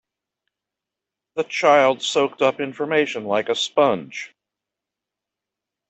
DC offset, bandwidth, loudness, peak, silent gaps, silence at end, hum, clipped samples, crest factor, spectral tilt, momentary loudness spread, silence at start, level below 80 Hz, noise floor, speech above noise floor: under 0.1%; 8.4 kHz; -20 LUFS; -4 dBFS; none; 1.6 s; none; under 0.1%; 20 dB; -3.5 dB/octave; 15 LU; 1.35 s; -70 dBFS; -86 dBFS; 66 dB